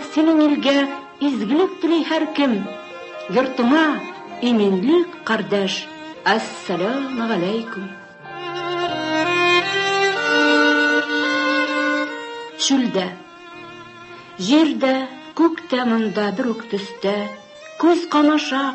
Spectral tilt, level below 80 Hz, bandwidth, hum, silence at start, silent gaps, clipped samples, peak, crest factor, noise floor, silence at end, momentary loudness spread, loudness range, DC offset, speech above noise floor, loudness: -4 dB/octave; -66 dBFS; 8.6 kHz; none; 0 s; none; under 0.1%; -4 dBFS; 16 dB; -39 dBFS; 0 s; 17 LU; 5 LU; under 0.1%; 21 dB; -19 LUFS